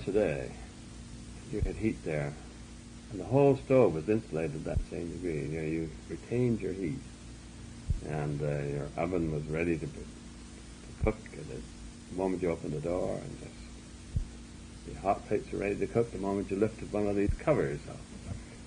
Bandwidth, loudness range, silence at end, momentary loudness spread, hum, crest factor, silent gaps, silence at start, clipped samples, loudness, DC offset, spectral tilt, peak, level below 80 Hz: 10.5 kHz; 6 LU; 0 s; 18 LU; none; 20 dB; none; 0 s; under 0.1%; -33 LUFS; under 0.1%; -7 dB/octave; -12 dBFS; -46 dBFS